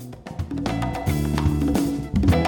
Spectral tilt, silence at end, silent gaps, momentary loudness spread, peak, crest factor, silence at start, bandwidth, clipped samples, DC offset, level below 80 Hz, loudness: -7 dB/octave; 0 s; none; 9 LU; -6 dBFS; 16 dB; 0 s; 19 kHz; under 0.1%; under 0.1%; -30 dBFS; -24 LUFS